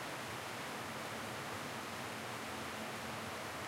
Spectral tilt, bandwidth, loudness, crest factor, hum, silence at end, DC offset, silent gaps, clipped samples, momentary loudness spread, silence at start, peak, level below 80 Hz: -3 dB/octave; 16 kHz; -43 LUFS; 14 dB; none; 0 s; under 0.1%; none; under 0.1%; 0 LU; 0 s; -30 dBFS; -72 dBFS